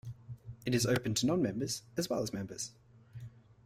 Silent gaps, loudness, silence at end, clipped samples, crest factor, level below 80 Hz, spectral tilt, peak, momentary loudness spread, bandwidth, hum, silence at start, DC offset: none; -34 LUFS; 0.35 s; under 0.1%; 18 dB; -62 dBFS; -4.5 dB/octave; -16 dBFS; 20 LU; 16 kHz; none; 0.05 s; under 0.1%